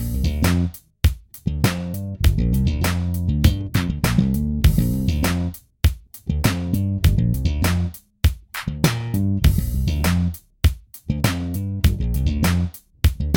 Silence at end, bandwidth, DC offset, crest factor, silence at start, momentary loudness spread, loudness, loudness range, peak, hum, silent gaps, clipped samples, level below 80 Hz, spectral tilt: 0 s; 17.5 kHz; under 0.1%; 18 dB; 0 s; 8 LU; -22 LUFS; 2 LU; -2 dBFS; none; none; under 0.1%; -24 dBFS; -6 dB/octave